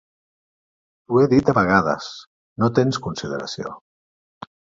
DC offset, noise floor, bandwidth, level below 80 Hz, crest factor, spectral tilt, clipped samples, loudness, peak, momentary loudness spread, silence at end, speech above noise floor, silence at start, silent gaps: under 0.1%; under -90 dBFS; 7.8 kHz; -52 dBFS; 20 dB; -6.5 dB/octave; under 0.1%; -20 LUFS; -2 dBFS; 18 LU; 1 s; over 71 dB; 1.1 s; 2.27-2.56 s